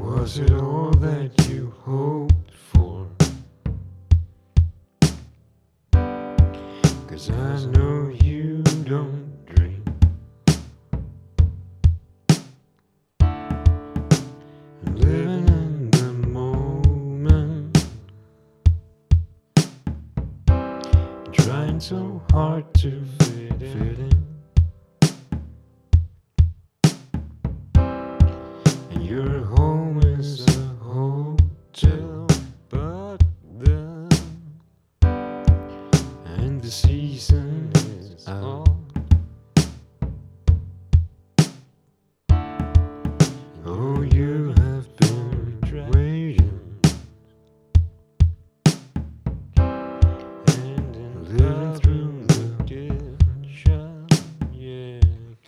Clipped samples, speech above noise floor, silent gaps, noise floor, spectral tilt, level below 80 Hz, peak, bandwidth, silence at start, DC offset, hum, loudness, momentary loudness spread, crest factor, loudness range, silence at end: under 0.1%; 46 dB; none; -65 dBFS; -6.5 dB/octave; -26 dBFS; -2 dBFS; 12 kHz; 0 s; under 0.1%; none; -22 LUFS; 11 LU; 18 dB; 2 LU; 0.15 s